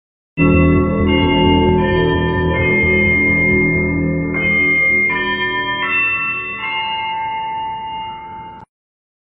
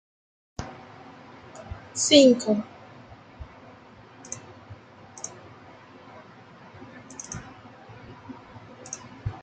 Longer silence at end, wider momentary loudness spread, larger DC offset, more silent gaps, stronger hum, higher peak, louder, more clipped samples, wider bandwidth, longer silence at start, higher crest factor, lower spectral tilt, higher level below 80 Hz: first, 0.6 s vs 0.05 s; second, 12 LU vs 28 LU; neither; neither; neither; about the same, 0 dBFS vs -2 dBFS; first, -15 LUFS vs -21 LUFS; neither; second, 4.8 kHz vs 9.6 kHz; second, 0.35 s vs 0.6 s; second, 16 dB vs 28 dB; about the same, -4 dB/octave vs -3.5 dB/octave; first, -30 dBFS vs -54 dBFS